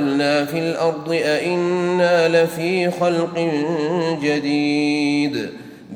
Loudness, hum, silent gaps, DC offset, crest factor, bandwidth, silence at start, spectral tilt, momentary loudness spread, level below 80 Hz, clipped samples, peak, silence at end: -19 LUFS; none; none; under 0.1%; 14 dB; 17 kHz; 0 s; -5.5 dB/octave; 5 LU; -66 dBFS; under 0.1%; -4 dBFS; 0 s